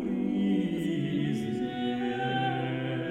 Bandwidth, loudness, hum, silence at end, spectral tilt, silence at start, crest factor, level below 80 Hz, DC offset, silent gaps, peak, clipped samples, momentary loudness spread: 13.5 kHz; -30 LUFS; none; 0 s; -7.5 dB/octave; 0 s; 12 dB; -60 dBFS; under 0.1%; none; -18 dBFS; under 0.1%; 4 LU